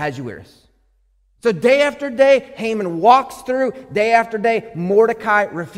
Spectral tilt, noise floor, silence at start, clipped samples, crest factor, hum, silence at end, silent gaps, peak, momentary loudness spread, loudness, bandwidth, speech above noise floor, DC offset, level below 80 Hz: -5.5 dB/octave; -59 dBFS; 0 s; under 0.1%; 16 dB; none; 0 s; none; 0 dBFS; 9 LU; -16 LUFS; 14.5 kHz; 43 dB; under 0.1%; -56 dBFS